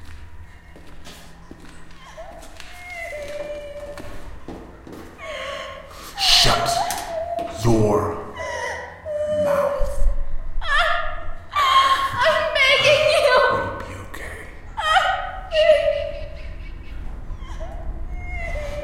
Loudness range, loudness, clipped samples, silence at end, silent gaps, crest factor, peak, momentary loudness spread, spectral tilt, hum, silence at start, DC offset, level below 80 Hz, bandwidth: 18 LU; -20 LUFS; under 0.1%; 0 s; none; 20 dB; 0 dBFS; 23 LU; -3 dB/octave; none; 0 s; under 0.1%; -30 dBFS; 16 kHz